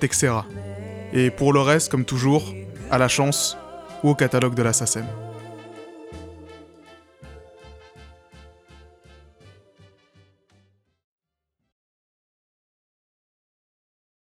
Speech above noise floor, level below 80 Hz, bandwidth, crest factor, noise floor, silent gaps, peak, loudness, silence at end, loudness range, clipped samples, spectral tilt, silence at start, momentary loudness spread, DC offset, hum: 61 dB; -52 dBFS; 16 kHz; 20 dB; -81 dBFS; none; -6 dBFS; -21 LUFS; 5.95 s; 23 LU; under 0.1%; -4.5 dB/octave; 0 s; 22 LU; under 0.1%; none